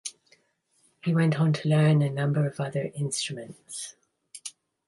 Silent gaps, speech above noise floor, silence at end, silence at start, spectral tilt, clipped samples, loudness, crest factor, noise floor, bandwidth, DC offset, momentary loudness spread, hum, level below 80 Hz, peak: none; 44 dB; 0.4 s; 0.05 s; -6 dB/octave; under 0.1%; -26 LUFS; 16 dB; -69 dBFS; 11.5 kHz; under 0.1%; 18 LU; none; -70 dBFS; -12 dBFS